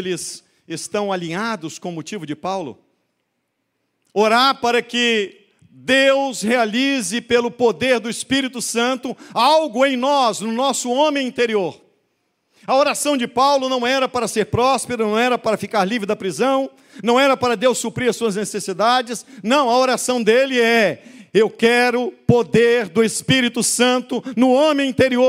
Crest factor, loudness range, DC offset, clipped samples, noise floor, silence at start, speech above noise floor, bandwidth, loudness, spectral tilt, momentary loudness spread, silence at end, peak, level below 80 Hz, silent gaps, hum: 18 dB; 4 LU; under 0.1%; under 0.1%; -73 dBFS; 0 s; 55 dB; 16 kHz; -18 LUFS; -3.5 dB/octave; 11 LU; 0 s; 0 dBFS; -58 dBFS; none; none